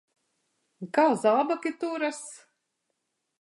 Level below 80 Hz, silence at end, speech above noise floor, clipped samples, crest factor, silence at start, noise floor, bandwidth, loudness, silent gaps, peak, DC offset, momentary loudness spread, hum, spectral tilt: -86 dBFS; 1.05 s; 54 dB; under 0.1%; 18 dB; 0.8 s; -80 dBFS; 11.5 kHz; -26 LUFS; none; -10 dBFS; under 0.1%; 19 LU; none; -4.5 dB/octave